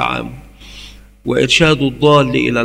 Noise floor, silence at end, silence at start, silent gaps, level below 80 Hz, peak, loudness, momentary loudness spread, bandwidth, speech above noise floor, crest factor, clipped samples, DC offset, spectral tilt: -37 dBFS; 0 s; 0 s; none; -38 dBFS; 0 dBFS; -13 LUFS; 21 LU; 15 kHz; 24 dB; 14 dB; under 0.1%; under 0.1%; -5 dB/octave